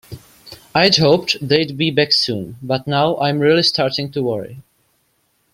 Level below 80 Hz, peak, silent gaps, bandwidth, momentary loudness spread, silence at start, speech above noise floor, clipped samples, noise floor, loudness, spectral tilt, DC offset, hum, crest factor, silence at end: -54 dBFS; 0 dBFS; none; 16 kHz; 10 LU; 0.1 s; 47 dB; under 0.1%; -64 dBFS; -16 LUFS; -5 dB/octave; under 0.1%; none; 18 dB; 0.95 s